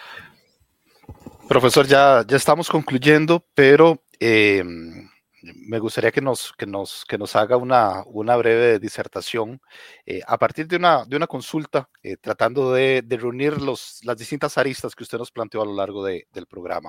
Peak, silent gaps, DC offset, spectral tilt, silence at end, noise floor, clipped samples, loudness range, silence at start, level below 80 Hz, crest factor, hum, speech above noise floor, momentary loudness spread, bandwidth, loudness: 0 dBFS; none; under 0.1%; -5 dB/octave; 0 s; -63 dBFS; under 0.1%; 8 LU; 0 s; -58 dBFS; 20 dB; none; 44 dB; 17 LU; 16.5 kHz; -19 LUFS